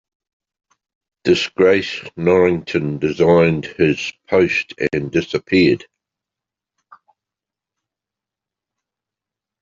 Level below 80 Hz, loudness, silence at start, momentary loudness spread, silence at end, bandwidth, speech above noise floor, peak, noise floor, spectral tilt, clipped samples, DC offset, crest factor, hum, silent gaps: -54 dBFS; -17 LUFS; 1.25 s; 7 LU; 3.85 s; 7.6 kHz; 70 dB; -2 dBFS; -87 dBFS; -6 dB/octave; under 0.1%; under 0.1%; 18 dB; none; none